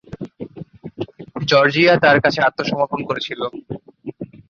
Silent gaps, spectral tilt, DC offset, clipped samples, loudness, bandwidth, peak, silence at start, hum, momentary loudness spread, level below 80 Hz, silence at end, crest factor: none; -5.5 dB/octave; under 0.1%; under 0.1%; -16 LUFS; 7 kHz; -2 dBFS; 0.1 s; none; 22 LU; -54 dBFS; 0.25 s; 18 dB